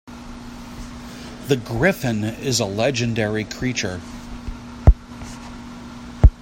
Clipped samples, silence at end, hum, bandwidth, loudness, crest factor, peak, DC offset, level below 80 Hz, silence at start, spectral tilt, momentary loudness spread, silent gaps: under 0.1%; 0 s; none; 16 kHz; -21 LUFS; 22 dB; 0 dBFS; under 0.1%; -26 dBFS; 0.05 s; -5 dB/octave; 18 LU; none